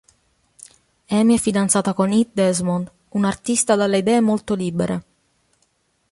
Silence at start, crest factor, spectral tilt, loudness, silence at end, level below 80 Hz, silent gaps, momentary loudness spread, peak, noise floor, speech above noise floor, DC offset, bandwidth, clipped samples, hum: 1.1 s; 16 dB; -5 dB/octave; -19 LUFS; 1.1 s; -54 dBFS; none; 7 LU; -4 dBFS; -66 dBFS; 47 dB; under 0.1%; 11.5 kHz; under 0.1%; none